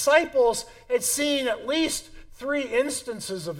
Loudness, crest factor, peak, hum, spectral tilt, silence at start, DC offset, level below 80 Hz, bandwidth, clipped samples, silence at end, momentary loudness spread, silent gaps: -25 LUFS; 20 dB; -6 dBFS; none; -2 dB/octave; 0 s; under 0.1%; -52 dBFS; 17 kHz; under 0.1%; 0 s; 11 LU; none